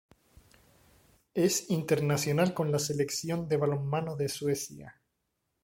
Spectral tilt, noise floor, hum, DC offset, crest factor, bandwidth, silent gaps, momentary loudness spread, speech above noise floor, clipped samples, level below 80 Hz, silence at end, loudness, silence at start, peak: -5 dB/octave; -81 dBFS; none; under 0.1%; 18 dB; 16.5 kHz; none; 6 LU; 51 dB; under 0.1%; -64 dBFS; 0.75 s; -30 LUFS; 1.35 s; -12 dBFS